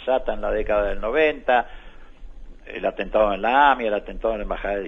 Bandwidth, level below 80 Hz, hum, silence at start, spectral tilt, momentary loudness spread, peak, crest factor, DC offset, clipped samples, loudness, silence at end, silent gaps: 7 kHz; -36 dBFS; none; 0 s; -6.5 dB/octave; 10 LU; -4 dBFS; 18 dB; under 0.1%; under 0.1%; -22 LUFS; 0 s; none